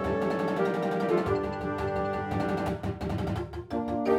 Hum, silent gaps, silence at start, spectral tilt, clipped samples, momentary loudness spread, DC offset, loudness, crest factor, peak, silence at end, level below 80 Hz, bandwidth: none; none; 0 s; -7.5 dB/octave; under 0.1%; 6 LU; under 0.1%; -30 LUFS; 16 dB; -14 dBFS; 0 s; -46 dBFS; 15 kHz